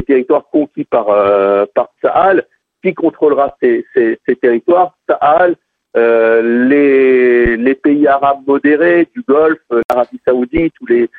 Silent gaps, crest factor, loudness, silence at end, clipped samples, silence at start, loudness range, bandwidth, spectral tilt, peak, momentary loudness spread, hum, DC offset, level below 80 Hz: 9.84-9.89 s; 10 dB; -12 LUFS; 0.1 s; under 0.1%; 0 s; 3 LU; 4.5 kHz; -8.5 dB/octave; 0 dBFS; 6 LU; none; under 0.1%; -40 dBFS